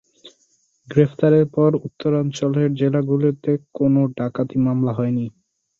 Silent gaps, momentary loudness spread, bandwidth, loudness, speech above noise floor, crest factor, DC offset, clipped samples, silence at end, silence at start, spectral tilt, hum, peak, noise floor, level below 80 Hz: none; 7 LU; 7.6 kHz; -19 LUFS; 45 dB; 18 dB; under 0.1%; under 0.1%; 0.5 s; 0.25 s; -8.5 dB/octave; none; -2 dBFS; -63 dBFS; -58 dBFS